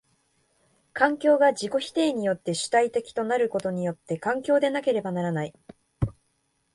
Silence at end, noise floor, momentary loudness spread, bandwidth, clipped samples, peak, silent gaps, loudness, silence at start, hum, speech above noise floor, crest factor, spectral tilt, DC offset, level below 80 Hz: 0.65 s; -72 dBFS; 11 LU; 11.5 kHz; under 0.1%; -6 dBFS; none; -25 LUFS; 0.95 s; none; 47 dB; 20 dB; -5 dB/octave; under 0.1%; -54 dBFS